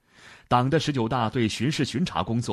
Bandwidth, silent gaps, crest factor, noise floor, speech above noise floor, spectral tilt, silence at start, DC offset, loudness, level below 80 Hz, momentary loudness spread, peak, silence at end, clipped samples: 13 kHz; none; 18 dB; -52 dBFS; 27 dB; -5.5 dB/octave; 0.25 s; under 0.1%; -25 LUFS; -52 dBFS; 4 LU; -8 dBFS; 0 s; under 0.1%